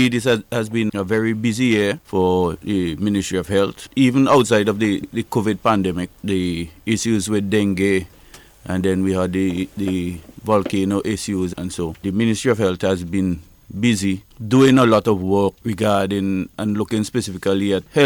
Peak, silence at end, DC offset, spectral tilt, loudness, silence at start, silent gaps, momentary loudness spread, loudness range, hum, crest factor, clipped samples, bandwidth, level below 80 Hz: -4 dBFS; 0 s; under 0.1%; -5.5 dB/octave; -19 LUFS; 0 s; none; 9 LU; 4 LU; none; 14 dB; under 0.1%; 17.5 kHz; -48 dBFS